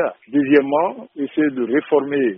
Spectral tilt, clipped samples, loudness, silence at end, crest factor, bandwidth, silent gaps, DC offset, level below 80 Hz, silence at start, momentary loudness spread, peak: -2 dB/octave; under 0.1%; -19 LUFS; 0 s; 16 dB; 3.9 kHz; none; under 0.1%; -66 dBFS; 0 s; 9 LU; -2 dBFS